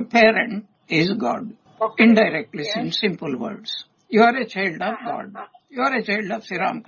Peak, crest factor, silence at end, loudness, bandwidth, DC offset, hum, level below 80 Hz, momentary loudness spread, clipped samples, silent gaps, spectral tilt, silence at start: 0 dBFS; 20 dB; 0.05 s; -20 LUFS; 7 kHz; under 0.1%; none; -66 dBFS; 16 LU; under 0.1%; none; -5.5 dB/octave; 0 s